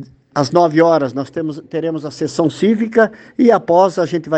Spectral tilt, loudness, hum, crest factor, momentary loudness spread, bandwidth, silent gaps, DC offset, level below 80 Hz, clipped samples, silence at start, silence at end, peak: -6.5 dB/octave; -15 LUFS; none; 14 dB; 11 LU; 8.8 kHz; none; under 0.1%; -60 dBFS; under 0.1%; 0 s; 0 s; 0 dBFS